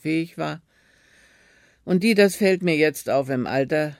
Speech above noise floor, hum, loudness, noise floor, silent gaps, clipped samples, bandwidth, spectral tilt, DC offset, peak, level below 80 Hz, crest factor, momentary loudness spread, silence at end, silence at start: 37 dB; none; -21 LUFS; -58 dBFS; none; under 0.1%; 16.5 kHz; -5.5 dB/octave; under 0.1%; -4 dBFS; -64 dBFS; 18 dB; 13 LU; 0.05 s; 0.05 s